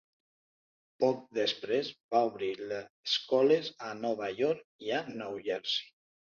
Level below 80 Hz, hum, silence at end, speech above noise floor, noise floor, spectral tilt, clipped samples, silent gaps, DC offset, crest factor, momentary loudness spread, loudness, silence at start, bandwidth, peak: -78 dBFS; none; 0.55 s; over 58 dB; under -90 dBFS; -4.5 dB/octave; under 0.1%; 2.03-2.09 s, 2.90-3.04 s, 4.64-4.79 s; under 0.1%; 18 dB; 11 LU; -32 LUFS; 1 s; 7.2 kHz; -14 dBFS